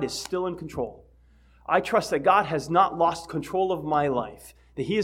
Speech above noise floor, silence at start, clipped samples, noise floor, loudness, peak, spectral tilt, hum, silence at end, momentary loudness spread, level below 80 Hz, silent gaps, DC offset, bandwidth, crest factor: 31 dB; 0 s; under 0.1%; -56 dBFS; -25 LUFS; -6 dBFS; -5 dB/octave; none; 0 s; 13 LU; -54 dBFS; none; under 0.1%; 16.5 kHz; 20 dB